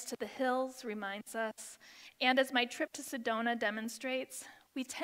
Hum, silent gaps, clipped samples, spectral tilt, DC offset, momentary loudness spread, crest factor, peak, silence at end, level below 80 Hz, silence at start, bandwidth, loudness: none; none; under 0.1%; -2 dB/octave; under 0.1%; 16 LU; 22 dB; -14 dBFS; 0 s; -86 dBFS; 0 s; 16 kHz; -36 LUFS